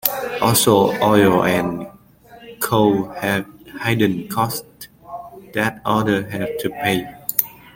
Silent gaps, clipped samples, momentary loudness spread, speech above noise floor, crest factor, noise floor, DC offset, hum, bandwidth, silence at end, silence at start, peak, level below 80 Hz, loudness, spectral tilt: none; under 0.1%; 20 LU; 28 dB; 20 dB; -46 dBFS; under 0.1%; none; 17 kHz; 0.25 s; 0.05 s; 0 dBFS; -52 dBFS; -19 LUFS; -4.5 dB/octave